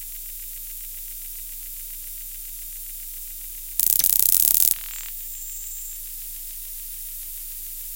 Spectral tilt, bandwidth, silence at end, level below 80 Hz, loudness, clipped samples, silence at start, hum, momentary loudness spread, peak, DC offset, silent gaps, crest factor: 1.5 dB/octave; 18 kHz; 0 s; -44 dBFS; -23 LUFS; under 0.1%; 0 s; none; 17 LU; 0 dBFS; under 0.1%; none; 26 dB